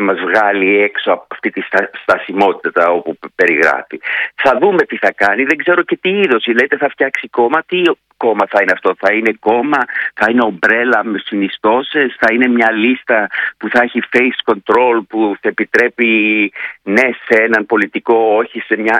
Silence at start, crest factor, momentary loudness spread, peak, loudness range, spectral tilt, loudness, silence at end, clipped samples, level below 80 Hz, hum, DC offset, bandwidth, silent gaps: 0 s; 14 dB; 6 LU; 0 dBFS; 1 LU; -5.5 dB/octave; -13 LUFS; 0 s; 0.2%; -60 dBFS; none; under 0.1%; 11 kHz; none